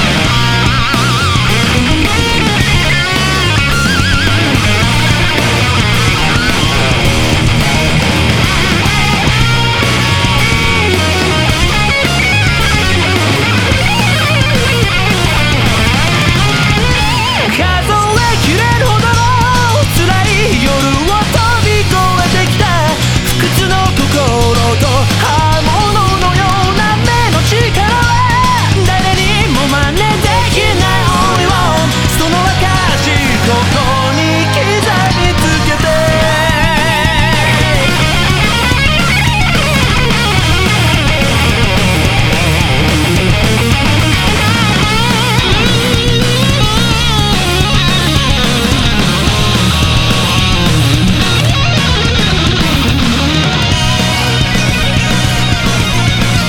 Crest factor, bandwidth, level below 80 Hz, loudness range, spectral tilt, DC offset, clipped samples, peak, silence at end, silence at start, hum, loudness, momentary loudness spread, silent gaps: 10 dB; 18.5 kHz; -20 dBFS; 1 LU; -4.5 dB/octave; under 0.1%; under 0.1%; 0 dBFS; 0 s; 0 s; none; -10 LUFS; 1 LU; none